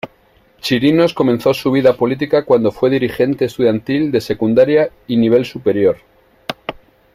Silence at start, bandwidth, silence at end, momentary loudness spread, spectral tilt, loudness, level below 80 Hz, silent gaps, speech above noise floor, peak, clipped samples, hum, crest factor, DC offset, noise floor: 0.05 s; 15.5 kHz; 0.45 s; 13 LU; -7 dB/octave; -15 LUFS; -50 dBFS; none; 38 dB; 0 dBFS; under 0.1%; none; 14 dB; under 0.1%; -52 dBFS